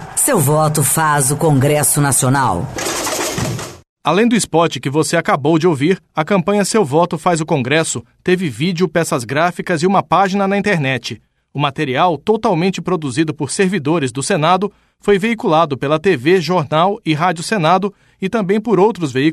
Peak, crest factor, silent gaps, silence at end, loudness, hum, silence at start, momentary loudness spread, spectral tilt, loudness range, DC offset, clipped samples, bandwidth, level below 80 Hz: -2 dBFS; 14 dB; 3.89-3.96 s; 0 s; -15 LUFS; none; 0 s; 7 LU; -4.5 dB/octave; 2 LU; under 0.1%; under 0.1%; 13.5 kHz; -48 dBFS